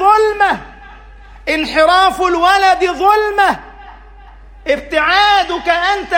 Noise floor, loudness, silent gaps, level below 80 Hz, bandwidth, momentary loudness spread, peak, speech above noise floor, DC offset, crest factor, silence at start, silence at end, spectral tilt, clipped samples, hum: -37 dBFS; -12 LUFS; none; -38 dBFS; 16.5 kHz; 9 LU; 0 dBFS; 25 dB; under 0.1%; 14 dB; 0 s; 0 s; -3 dB/octave; under 0.1%; none